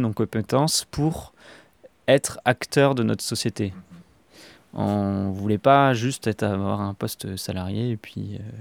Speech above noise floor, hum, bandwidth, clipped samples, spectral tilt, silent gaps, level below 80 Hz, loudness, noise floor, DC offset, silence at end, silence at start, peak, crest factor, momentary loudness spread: 27 dB; none; 18 kHz; under 0.1%; -5 dB/octave; none; -54 dBFS; -23 LUFS; -51 dBFS; under 0.1%; 0 s; 0 s; -2 dBFS; 22 dB; 12 LU